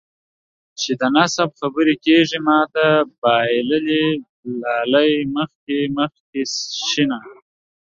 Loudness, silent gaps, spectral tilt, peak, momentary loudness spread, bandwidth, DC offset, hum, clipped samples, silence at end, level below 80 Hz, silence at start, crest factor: -18 LUFS; 3.18-3.22 s, 4.29-4.43 s, 5.55-5.67 s, 6.20-6.33 s; -4 dB/octave; -2 dBFS; 10 LU; 7.6 kHz; under 0.1%; none; under 0.1%; 0.5 s; -62 dBFS; 0.8 s; 16 dB